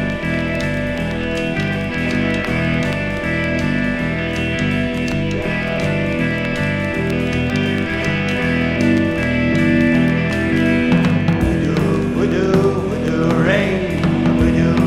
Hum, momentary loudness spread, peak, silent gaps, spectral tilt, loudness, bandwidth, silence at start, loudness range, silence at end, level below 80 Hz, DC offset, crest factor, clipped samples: none; 5 LU; -2 dBFS; none; -7 dB/octave; -17 LUFS; 13 kHz; 0 s; 3 LU; 0 s; -32 dBFS; under 0.1%; 16 dB; under 0.1%